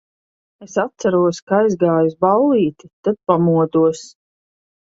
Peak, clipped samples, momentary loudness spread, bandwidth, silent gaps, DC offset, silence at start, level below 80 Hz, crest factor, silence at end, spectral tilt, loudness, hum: 0 dBFS; under 0.1%; 8 LU; 7.8 kHz; 1.42-1.47 s, 2.93-3.03 s; under 0.1%; 0.6 s; -60 dBFS; 16 dB; 0.8 s; -7 dB/octave; -17 LUFS; none